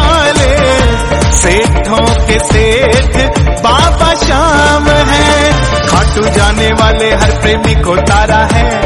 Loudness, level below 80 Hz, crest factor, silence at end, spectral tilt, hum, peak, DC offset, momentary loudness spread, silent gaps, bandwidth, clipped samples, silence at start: -8 LUFS; -14 dBFS; 8 dB; 0 s; -4.5 dB/octave; none; 0 dBFS; under 0.1%; 3 LU; none; 12 kHz; 0.3%; 0 s